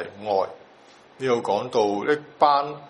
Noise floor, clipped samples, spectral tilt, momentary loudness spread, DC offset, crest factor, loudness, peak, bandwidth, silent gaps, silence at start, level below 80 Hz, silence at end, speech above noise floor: -51 dBFS; under 0.1%; -5 dB/octave; 6 LU; under 0.1%; 20 dB; -23 LUFS; -4 dBFS; 10.5 kHz; none; 0 s; -72 dBFS; 0 s; 28 dB